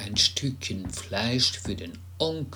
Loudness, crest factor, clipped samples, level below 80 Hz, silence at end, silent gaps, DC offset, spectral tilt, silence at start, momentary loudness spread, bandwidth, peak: -27 LUFS; 20 dB; under 0.1%; -50 dBFS; 0 s; none; under 0.1%; -3.5 dB/octave; 0 s; 12 LU; over 20 kHz; -8 dBFS